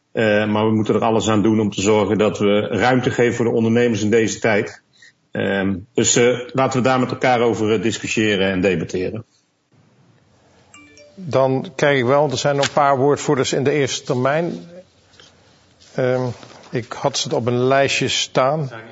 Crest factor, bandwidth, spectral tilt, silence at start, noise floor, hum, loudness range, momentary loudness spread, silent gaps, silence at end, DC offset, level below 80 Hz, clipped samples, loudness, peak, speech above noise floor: 18 dB; 8 kHz; -4.5 dB/octave; 0.15 s; -58 dBFS; none; 7 LU; 8 LU; none; 0 s; under 0.1%; -56 dBFS; under 0.1%; -18 LUFS; 0 dBFS; 40 dB